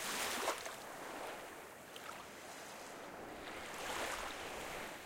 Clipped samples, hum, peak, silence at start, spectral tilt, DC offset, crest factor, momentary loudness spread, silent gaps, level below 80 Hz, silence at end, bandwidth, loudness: under 0.1%; none; -24 dBFS; 0 s; -1.5 dB/octave; under 0.1%; 22 dB; 12 LU; none; -68 dBFS; 0 s; 16.5 kHz; -45 LUFS